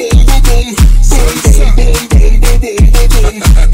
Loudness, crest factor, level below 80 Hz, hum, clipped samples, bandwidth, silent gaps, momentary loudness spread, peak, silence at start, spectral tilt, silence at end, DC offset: -9 LUFS; 4 dB; -4 dBFS; none; 8%; 16.5 kHz; none; 3 LU; 0 dBFS; 0 s; -5 dB/octave; 0 s; under 0.1%